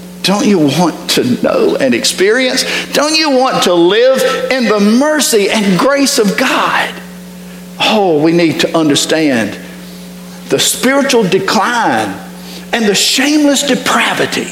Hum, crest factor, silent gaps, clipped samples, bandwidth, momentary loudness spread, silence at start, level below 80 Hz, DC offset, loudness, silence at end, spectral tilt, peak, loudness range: none; 12 dB; none; under 0.1%; 17 kHz; 18 LU; 0 s; -50 dBFS; under 0.1%; -10 LUFS; 0 s; -3.5 dB/octave; 0 dBFS; 3 LU